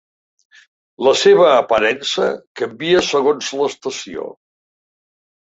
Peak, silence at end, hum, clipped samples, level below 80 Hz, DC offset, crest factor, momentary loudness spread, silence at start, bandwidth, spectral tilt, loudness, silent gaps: -2 dBFS; 1.2 s; none; under 0.1%; -58 dBFS; under 0.1%; 16 dB; 15 LU; 1 s; 8 kHz; -3.5 dB/octave; -16 LUFS; 2.47-2.55 s